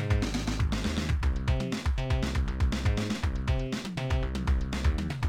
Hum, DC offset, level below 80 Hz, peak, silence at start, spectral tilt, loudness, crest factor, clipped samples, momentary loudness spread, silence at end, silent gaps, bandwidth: none; 0.2%; -32 dBFS; -16 dBFS; 0 s; -6 dB/octave; -30 LUFS; 12 dB; under 0.1%; 2 LU; 0 s; none; 13 kHz